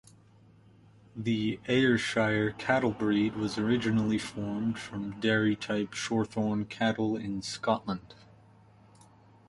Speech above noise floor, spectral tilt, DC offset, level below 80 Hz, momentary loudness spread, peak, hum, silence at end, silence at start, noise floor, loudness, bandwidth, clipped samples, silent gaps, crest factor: 29 dB; -5.5 dB/octave; under 0.1%; -60 dBFS; 8 LU; -10 dBFS; none; 1.35 s; 1.15 s; -58 dBFS; -30 LUFS; 11.5 kHz; under 0.1%; none; 20 dB